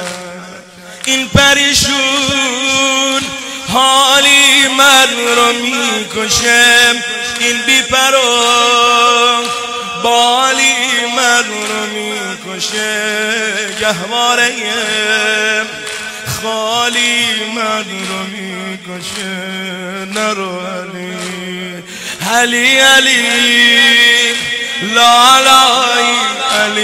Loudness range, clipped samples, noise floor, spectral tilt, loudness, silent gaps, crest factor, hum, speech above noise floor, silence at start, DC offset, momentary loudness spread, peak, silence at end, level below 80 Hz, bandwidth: 10 LU; under 0.1%; -32 dBFS; -1 dB/octave; -10 LUFS; none; 12 dB; none; 21 dB; 0 s; under 0.1%; 16 LU; 0 dBFS; 0 s; -44 dBFS; 16.5 kHz